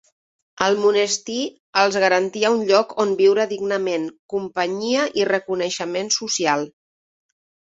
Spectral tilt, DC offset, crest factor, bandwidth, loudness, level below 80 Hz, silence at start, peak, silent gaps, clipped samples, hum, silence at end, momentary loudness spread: -2.5 dB/octave; under 0.1%; 18 dB; 8 kHz; -20 LUFS; -66 dBFS; 0.55 s; -2 dBFS; 1.60-1.73 s, 4.19-4.29 s; under 0.1%; none; 1.05 s; 9 LU